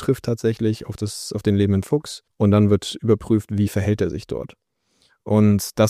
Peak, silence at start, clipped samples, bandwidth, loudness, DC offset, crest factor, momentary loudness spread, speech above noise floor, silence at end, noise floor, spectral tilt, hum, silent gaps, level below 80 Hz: -4 dBFS; 0 s; under 0.1%; 15.5 kHz; -21 LUFS; under 0.1%; 16 dB; 12 LU; 44 dB; 0 s; -64 dBFS; -7 dB/octave; none; none; -48 dBFS